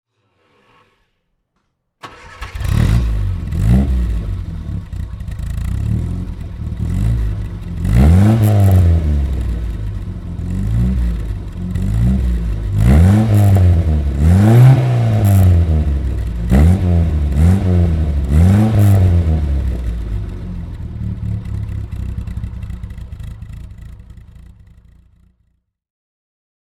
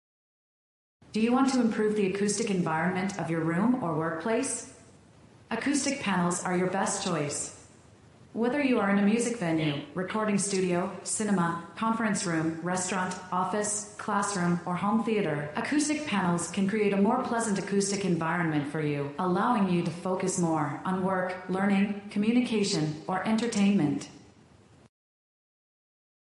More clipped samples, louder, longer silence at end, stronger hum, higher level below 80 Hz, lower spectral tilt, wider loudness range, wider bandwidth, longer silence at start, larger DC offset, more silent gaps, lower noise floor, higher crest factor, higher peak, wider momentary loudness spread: neither; first, -15 LUFS vs -28 LUFS; first, 2.65 s vs 2.1 s; neither; first, -20 dBFS vs -66 dBFS; first, -8.5 dB/octave vs -5 dB/octave; first, 14 LU vs 3 LU; first, 13.5 kHz vs 11.5 kHz; first, 2.05 s vs 1.15 s; neither; neither; first, -68 dBFS vs -57 dBFS; about the same, 14 dB vs 16 dB; first, 0 dBFS vs -14 dBFS; first, 16 LU vs 6 LU